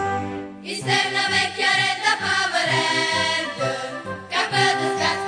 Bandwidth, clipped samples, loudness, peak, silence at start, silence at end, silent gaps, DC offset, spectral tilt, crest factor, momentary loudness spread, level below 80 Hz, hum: 10 kHz; under 0.1%; -20 LUFS; -6 dBFS; 0 s; 0 s; none; under 0.1%; -2.5 dB/octave; 18 dB; 10 LU; -62 dBFS; none